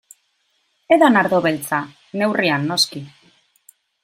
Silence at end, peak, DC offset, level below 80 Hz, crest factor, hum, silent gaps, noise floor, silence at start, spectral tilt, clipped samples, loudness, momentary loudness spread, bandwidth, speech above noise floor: 0.95 s; -2 dBFS; under 0.1%; -66 dBFS; 18 dB; none; none; -66 dBFS; 0.9 s; -4 dB/octave; under 0.1%; -17 LUFS; 11 LU; 16.5 kHz; 49 dB